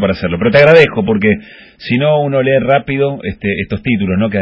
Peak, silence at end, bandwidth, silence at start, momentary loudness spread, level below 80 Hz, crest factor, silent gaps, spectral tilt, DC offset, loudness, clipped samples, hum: 0 dBFS; 0 s; 8 kHz; 0 s; 11 LU; -38 dBFS; 12 dB; none; -8 dB/octave; under 0.1%; -12 LUFS; 0.3%; none